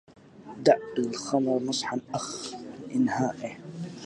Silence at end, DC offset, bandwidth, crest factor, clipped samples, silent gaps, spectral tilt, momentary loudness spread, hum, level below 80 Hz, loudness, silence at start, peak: 0 s; under 0.1%; 11.5 kHz; 22 dB; under 0.1%; none; -4.5 dB/octave; 15 LU; none; -68 dBFS; -28 LUFS; 0.1 s; -6 dBFS